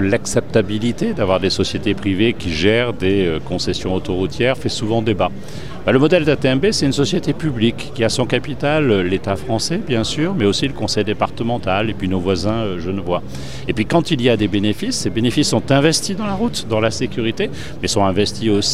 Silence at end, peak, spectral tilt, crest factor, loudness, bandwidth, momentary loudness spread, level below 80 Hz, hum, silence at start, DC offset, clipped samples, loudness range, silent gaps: 0 s; 0 dBFS; -5 dB/octave; 18 dB; -18 LUFS; 15.5 kHz; 6 LU; -40 dBFS; none; 0 s; 4%; under 0.1%; 2 LU; none